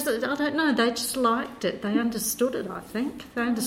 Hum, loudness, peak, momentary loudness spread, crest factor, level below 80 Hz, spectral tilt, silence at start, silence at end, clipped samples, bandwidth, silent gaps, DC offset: none; -26 LUFS; -10 dBFS; 8 LU; 16 dB; -58 dBFS; -3.5 dB/octave; 0 s; 0 s; under 0.1%; 16.5 kHz; none; under 0.1%